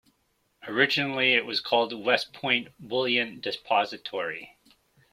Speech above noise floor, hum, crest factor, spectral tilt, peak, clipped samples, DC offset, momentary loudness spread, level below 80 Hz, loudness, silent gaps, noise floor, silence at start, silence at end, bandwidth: 45 dB; none; 22 dB; -4 dB/octave; -6 dBFS; under 0.1%; under 0.1%; 10 LU; -70 dBFS; -26 LUFS; none; -72 dBFS; 0.65 s; 0.65 s; 15.5 kHz